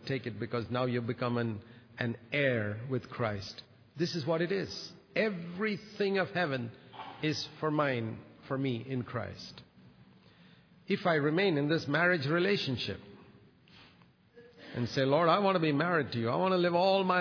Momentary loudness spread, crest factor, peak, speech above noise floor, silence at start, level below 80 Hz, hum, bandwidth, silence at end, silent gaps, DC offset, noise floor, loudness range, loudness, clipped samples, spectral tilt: 13 LU; 18 dB; -14 dBFS; 31 dB; 0 s; -70 dBFS; none; 5.4 kHz; 0 s; none; under 0.1%; -62 dBFS; 5 LU; -32 LUFS; under 0.1%; -6.5 dB/octave